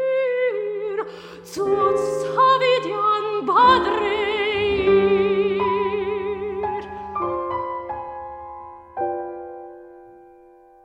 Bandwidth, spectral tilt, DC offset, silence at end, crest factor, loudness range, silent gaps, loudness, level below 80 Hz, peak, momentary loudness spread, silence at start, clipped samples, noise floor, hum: 10 kHz; -5 dB/octave; under 0.1%; 0.7 s; 16 dB; 11 LU; none; -21 LUFS; -50 dBFS; -4 dBFS; 19 LU; 0 s; under 0.1%; -49 dBFS; none